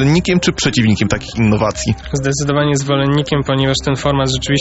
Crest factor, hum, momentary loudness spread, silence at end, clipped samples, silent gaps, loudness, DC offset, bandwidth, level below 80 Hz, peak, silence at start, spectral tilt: 14 dB; none; 4 LU; 0 s; under 0.1%; none; -15 LUFS; under 0.1%; 8.2 kHz; -34 dBFS; -2 dBFS; 0 s; -5 dB/octave